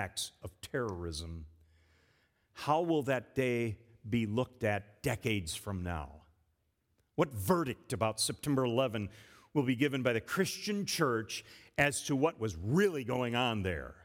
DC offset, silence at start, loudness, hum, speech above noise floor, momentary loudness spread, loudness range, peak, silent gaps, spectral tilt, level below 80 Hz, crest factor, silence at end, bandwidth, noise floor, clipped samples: under 0.1%; 0 s; -34 LUFS; none; 44 dB; 11 LU; 4 LU; -12 dBFS; none; -5 dB/octave; -60 dBFS; 22 dB; 0.1 s; 18 kHz; -77 dBFS; under 0.1%